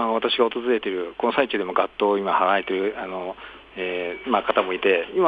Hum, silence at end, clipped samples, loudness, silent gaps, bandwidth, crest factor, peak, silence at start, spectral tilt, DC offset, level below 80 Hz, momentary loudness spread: none; 0 s; under 0.1%; -23 LUFS; none; 5 kHz; 18 dB; -4 dBFS; 0 s; -6.5 dB/octave; under 0.1%; -60 dBFS; 10 LU